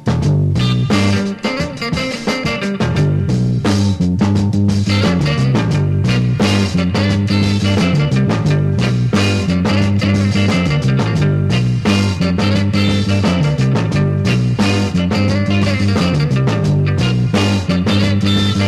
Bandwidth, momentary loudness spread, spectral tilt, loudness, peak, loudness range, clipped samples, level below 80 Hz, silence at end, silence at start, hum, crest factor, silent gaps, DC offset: 12 kHz; 2 LU; -6.5 dB/octave; -15 LUFS; 0 dBFS; 2 LU; under 0.1%; -36 dBFS; 0 s; 0 s; none; 12 dB; none; under 0.1%